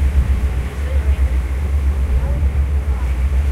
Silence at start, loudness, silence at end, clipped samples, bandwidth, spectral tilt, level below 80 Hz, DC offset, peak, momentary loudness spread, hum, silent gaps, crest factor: 0 s; -19 LUFS; 0 s; under 0.1%; 10.5 kHz; -7.5 dB/octave; -16 dBFS; under 0.1%; -4 dBFS; 3 LU; none; none; 12 dB